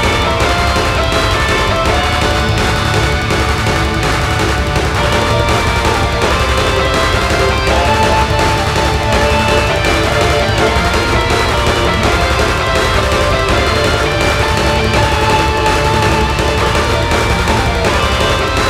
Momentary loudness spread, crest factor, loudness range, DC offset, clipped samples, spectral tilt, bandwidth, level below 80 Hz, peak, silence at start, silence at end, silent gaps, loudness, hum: 2 LU; 12 dB; 1 LU; under 0.1%; under 0.1%; -4.5 dB/octave; 16 kHz; -20 dBFS; 0 dBFS; 0 s; 0 s; none; -12 LUFS; none